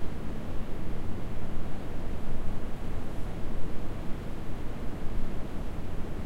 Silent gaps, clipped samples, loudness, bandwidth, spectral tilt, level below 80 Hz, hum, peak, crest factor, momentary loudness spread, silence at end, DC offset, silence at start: none; under 0.1%; -39 LUFS; 4.7 kHz; -7 dB/octave; -34 dBFS; none; -14 dBFS; 10 dB; 1 LU; 0 s; under 0.1%; 0 s